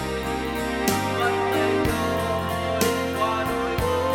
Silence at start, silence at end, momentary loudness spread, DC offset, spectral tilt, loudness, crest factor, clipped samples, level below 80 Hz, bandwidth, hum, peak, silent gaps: 0 s; 0 s; 4 LU; under 0.1%; -4.5 dB/octave; -24 LUFS; 18 dB; under 0.1%; -40 dBFS; over 20 kHz; none; -6 dBFS; none